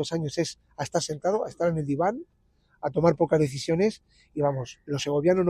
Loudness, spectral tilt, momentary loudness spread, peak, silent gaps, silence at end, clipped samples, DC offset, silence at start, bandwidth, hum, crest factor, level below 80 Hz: -27 LUFS; -6 dB/octave; 11 LU; -8 dBFS; none; 0 s; under 0.1%; under 0.1%; 0 s; 13.5 kHz; none; 18 dB; -60 dBFS